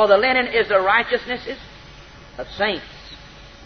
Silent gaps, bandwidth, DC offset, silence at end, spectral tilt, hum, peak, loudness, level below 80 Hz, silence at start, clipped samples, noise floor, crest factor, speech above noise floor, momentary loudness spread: none; 6.6 kHz; under 0.1%; 0 s; -4.5 dB/octave; none; -2 dBFS; -19 LUFS; -48 dBFS; 0 s; under 0.1%; -42 dBFS; 18 dB; 23 dB; 24 LU